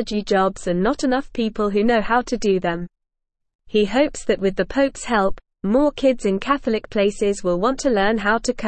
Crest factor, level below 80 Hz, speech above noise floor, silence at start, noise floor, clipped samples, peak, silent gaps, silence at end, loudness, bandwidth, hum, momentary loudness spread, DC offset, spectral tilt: 16 dB; -40 dBFS; 59 dB; 0 s; -78 dBFS; under 0.1%; -4 dBFS; 3.55-3.59 s; 0 s; -20 LUFS; 8.8 kHz; none; 4 LU; under 0.1%; -5 dB/octave